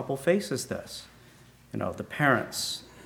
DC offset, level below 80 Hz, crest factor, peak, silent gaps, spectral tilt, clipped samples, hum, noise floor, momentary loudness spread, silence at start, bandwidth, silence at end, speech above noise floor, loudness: under 0.1%; -62 dBFS; 22 dB; -8 dBFS; none; -4 dB/octave; under 0.1%; none; -55 dBFS; 15 LU; 0 s; 20 kHz; 0 s; 26 dB; -29 LUFS